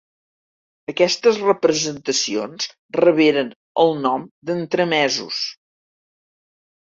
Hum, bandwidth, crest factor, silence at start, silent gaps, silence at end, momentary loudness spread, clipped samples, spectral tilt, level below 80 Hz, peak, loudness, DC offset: none; 7.8 kHz; 18 dB; 0.9 s; 2.79-2.89 s, 3.56-3.75 s, 4.31-4.42 s; 1.35 s; 10 LU; under 0.1%; -3.5 dB/octave; -66 dBFS; -2 dBFS; -19 LUFS; under 0.1%